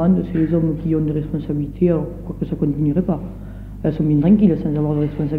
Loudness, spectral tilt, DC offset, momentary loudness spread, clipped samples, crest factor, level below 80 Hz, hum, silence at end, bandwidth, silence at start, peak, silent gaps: -19 LUFS; -11.5 dB/octave; under 0.1%; 12 LU; under 0.1%; 16 dB; -34 dBFS; none; 0 s; 4.2 kHz; 0 s; -4 dBFS; none